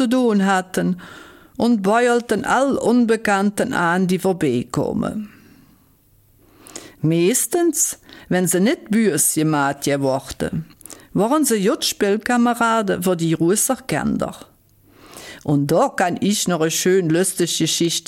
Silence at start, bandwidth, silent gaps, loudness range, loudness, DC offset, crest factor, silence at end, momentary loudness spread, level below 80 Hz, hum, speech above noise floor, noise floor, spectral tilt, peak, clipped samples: 0 s; 17 kHz; none; 4 LU; -18 LUFS; under 0.1%; 14 dB; 0.1 s; 10 LU; -52 dBFS; none; 37 dB; -55 dBFS; -4.5 dB/octave; -6 dBFS; under 0.1%